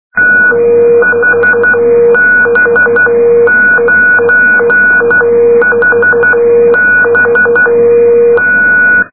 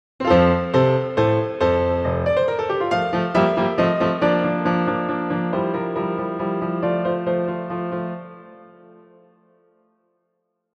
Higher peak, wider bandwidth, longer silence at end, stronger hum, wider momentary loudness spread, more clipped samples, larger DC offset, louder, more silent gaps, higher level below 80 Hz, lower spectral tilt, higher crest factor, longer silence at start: about the same, 0 dBFS vs -2 dBFS; second, 2.6 kHz vs 7.8 kHz; second, 0.05 s vs 2.1 s; neither; second, 1 LU vs 8 LU; first, 0.1% vs under 0.1%; first, 1% vs under 0.1%; first, -6 LUFS vs -21 LUFS; neither; about the same, -48 dBFS vs -46 dBFS; about the same, -9 dB/octave vs -8 dB/octave; second, 6 dB vs 20 dB; about the same, 0.15 s vs 0.2 s